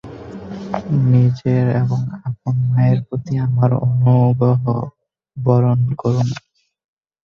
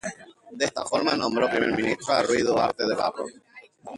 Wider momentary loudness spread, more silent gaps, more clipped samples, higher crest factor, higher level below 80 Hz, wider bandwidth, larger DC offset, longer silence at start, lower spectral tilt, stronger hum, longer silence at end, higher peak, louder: about the same, 16 LU vs 14 LU; neither; neither; about the same, 14 dB vs 18 dB; first, -48 dBFS vs -60 dBFS; second, 6.6 kHz vs 11.5 kHz; neither; about the same, 0.05 s vs 0.05 s; first, -9.5 dB/octave vs -3.5 dB/octave; neither; first, 0.85 s vs 0 s; first, -2 dBFS vs -8 dBFS; first, -17 LUFS vs -24 LUFS